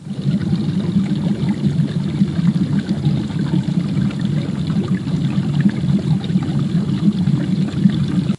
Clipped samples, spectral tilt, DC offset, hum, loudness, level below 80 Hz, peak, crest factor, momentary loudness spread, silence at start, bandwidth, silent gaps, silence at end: under 0.1%; -8 dB/octave; under 0.1%; none; -18 LUFS; -46 dBFS; 0 dBFS; 16 dB; 3 LU; 0 s; 11 kHz; none; 0 s